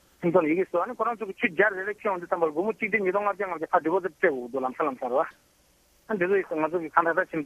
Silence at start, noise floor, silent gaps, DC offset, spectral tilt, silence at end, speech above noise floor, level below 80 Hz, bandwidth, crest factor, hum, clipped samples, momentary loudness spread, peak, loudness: 0.2 s; -63 dBFS; none; under 0.1%; -7 dB/octave; 0 s; 37 dB; -70 dBFS; 13 kHz; 22 dB; none; under 0.1%; 6 LU; -6 dBFS; -26 LUFS